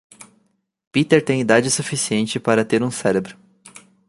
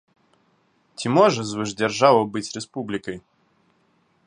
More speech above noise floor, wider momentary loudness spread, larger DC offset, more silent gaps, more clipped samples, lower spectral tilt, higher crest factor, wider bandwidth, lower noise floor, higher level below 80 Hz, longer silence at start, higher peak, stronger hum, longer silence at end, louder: first, 47 dB vs 43 dB; second, 6 LU vs 16 LU; neither; first, 0.87-0.91 s vs none; neither; about the same, -4.5 dB/octave vs -5 dB/octave; about the same, 18 dB vs 22 dB; about the same, 11.5 kHz vs 11 kHz; about the same, -65 dBFS vs -64 dBFS; about the same, -60 dBFS vs -64 dBFS; second, 0.2 s vs 1 s; about the same, -2 dBFS vs -2 dBFS; neither; second, 0.75 s vs 1.05 s; about the same, -19 LUFS vs -21 LUFS